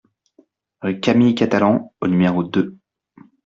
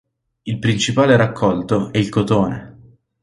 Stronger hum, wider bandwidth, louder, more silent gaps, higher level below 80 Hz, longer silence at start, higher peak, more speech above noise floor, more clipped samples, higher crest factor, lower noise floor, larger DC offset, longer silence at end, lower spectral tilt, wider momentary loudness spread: neither; second, 7.6 kHz vs 11.5 kHz; about the same, -18 LUFS vs -17 LUFS; neither; second, -56 dBFS vs -46 dBFS; first, 0.85 s vs 0.45 s; about the same, -2 dBFS vs -2 dBFS; first, 40 dB vs 31 dB; neither; about the same, 18 dB vs 16 dB; first, -57 dBFS vs -47 dBFS; neither; first, 0.7 s vs 0.5 s; first, -7.5 dB/octave vs -6 dB/octave; about the same, 10 LU vs 12 LU